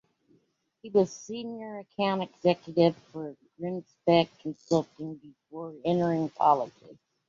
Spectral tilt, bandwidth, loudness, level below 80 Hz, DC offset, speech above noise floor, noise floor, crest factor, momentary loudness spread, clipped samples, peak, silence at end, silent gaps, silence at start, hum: -6.5 dB/octave; 7.6 kHz; -28 LUFS; -72 dBFS; under 0.1%; 41 dB; -69 dBFS; 20 dB; 16 LU; under 0.1%; -10 dBFS; 0.35 s; none; 0.85 s; none